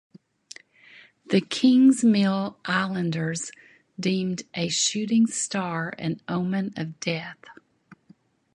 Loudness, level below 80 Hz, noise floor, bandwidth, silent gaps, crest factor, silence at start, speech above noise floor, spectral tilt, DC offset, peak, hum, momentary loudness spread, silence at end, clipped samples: -24 LUFS; -68 dBFS; -58 dBFS; 11.5 kHz; none; 18 dB; 1.3 s; 34 dB; -4.5 dB/octave; under 0.1%; -8 dBFS; none; 16 LU; 0.6 s; under 0.1%